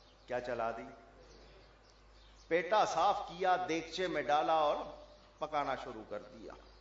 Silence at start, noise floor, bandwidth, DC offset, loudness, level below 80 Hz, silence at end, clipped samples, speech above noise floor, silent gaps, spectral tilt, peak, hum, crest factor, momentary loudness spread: 0.3 s; -61 dBFS; 7.6 kHz; under 0.1%; -35 LUFS; -64 dBFS; 0.05 s; under 0.1%; 27 dB; none; -2 dB/octave; -18 dBFS; none; 18 dB; 18 LU